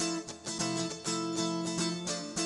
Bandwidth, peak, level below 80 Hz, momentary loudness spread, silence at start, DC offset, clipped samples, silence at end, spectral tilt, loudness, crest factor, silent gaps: 12.5 kHz; -18 dBFS; -68 dBFS; 3 LU; 0 s; under 0.1%; under 0.1%; 0 s; -3.5 dB/octave; -33 LUFS; 16 dB; none